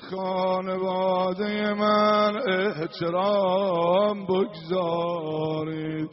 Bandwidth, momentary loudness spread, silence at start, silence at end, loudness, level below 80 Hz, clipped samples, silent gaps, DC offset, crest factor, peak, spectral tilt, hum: 6 kHz; 7 LU; 0 s; 0 s; -25 LUFS; -66 dBFS; under 0.1%; none; under 0.1%; 14 dB; -10 dBFS; -4 dB/octave; none